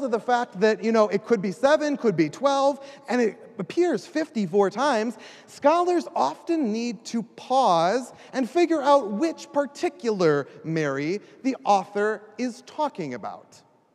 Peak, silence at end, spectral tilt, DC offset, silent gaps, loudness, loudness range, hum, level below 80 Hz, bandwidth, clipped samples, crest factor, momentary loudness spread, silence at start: -6 dBFS; 0.55 s; -5.5 dB/octave; under 0.1%; none; -24 LUFS; 3 LU; none; -80 dBFS; 12 kHz; under 0.1%; 18 dB; 11 LU; 0 s